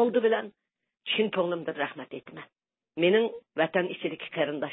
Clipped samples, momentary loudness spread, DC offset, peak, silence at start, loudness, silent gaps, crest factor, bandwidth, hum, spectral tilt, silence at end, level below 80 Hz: under 0.1%; 18 LU; under 0.1%; -12 dBFS; 0 s; -28 LUFS; none; 18 dB; 4 kHz; none; -9 dB/octave; 0 s; -80 dBFS